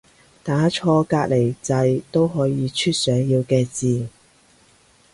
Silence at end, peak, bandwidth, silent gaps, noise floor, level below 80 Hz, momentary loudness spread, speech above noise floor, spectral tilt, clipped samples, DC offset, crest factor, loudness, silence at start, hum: 1.05 s; -6 dBFS; 11.5 kHz; none; -55 dBFS; -54 dBFS; 5 LU; 36 dB; -6 dB/octave; under 0.1%; under 0.1%; 16 dB; -20 LUFS; 0.45 s; none